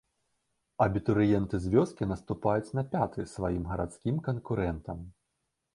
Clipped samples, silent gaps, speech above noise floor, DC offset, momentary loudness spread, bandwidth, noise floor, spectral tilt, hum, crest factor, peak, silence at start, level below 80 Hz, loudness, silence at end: under 0.1%; none; 52 dB; under 0.1%; 10 LU; 11.5 kHz; -82 dBFS; -8.5 dB/octave; none; 20 dB; -10 dBFS; 0.8 s; -48 dBFS; -30 LUFS; 0.65 s